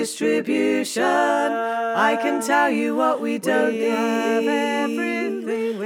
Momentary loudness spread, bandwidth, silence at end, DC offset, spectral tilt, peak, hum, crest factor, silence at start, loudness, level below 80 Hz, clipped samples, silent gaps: 5 LU; 17 kHz; 0 s; under 0.1%; -3.5 dB/octave; -4 dBFS; none; 16 dB; 0 s; -21 LUFS; -78 dBFS; under 0.1%; none